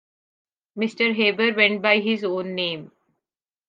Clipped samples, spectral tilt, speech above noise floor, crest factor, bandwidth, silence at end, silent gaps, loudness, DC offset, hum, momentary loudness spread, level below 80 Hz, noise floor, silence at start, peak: under 0.1%; -5.5 dB/octave; 66 dB; 20 dB; 7.6 kHz; 0.8 s; none; -21 LUFS; under 0.1%; none; 10 LU; -78 dBFS; -88 dBFS; 0.75 s; -4 dBFS